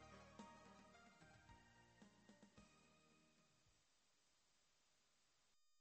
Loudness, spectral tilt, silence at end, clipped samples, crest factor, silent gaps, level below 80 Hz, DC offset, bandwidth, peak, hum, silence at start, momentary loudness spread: -66 LUFS; -4 dB/octave; 0 s; under 0.1%; 22 dB; none; -84 dBFS; under 0.1%; 8.4 kHz; -48 dBFS; none; 0 s; 6 LU